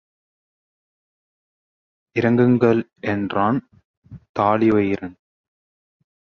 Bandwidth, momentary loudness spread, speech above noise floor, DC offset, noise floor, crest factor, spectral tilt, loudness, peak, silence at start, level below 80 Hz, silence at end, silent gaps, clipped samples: 6.6 kHz; 12 LU; over 71 dB; under 0.1%; under -90 dBFS; 18 dB; -9 dB/octave; -19 LUFS; -4 dBFS; 2.15 s; -56 dBFS; 1.15 s; 3.85-4.02 s, 4.29-4.34 s; under 0.1%